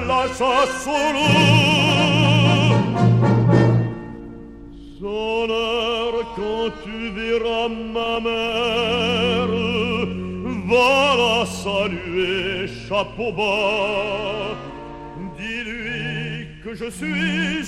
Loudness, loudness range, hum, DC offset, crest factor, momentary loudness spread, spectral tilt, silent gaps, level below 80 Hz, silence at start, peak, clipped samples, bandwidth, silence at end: -19 LUFS; 9 LU; none; under 0.1%; 18 dB; 15 LU; -5.5 dB/octave; none; -44 dBFS; 0 s; -2 dBFS; under 0.1%; 12.5 kHz; 0 s